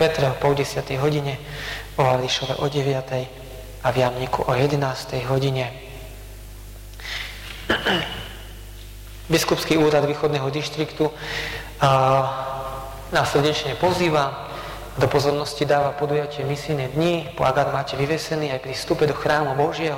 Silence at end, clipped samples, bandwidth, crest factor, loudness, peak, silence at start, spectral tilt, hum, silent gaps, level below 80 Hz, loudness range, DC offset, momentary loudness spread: 0 s; under 0.1%; 16.5 kHz; 14 dB; -22 LUFS; -8 dBFS; 0 s; -5 dB/octave; 50 Hz at -40 dBFS; none; -42 dBFS; 5 LU; under 0.1%; 17 LU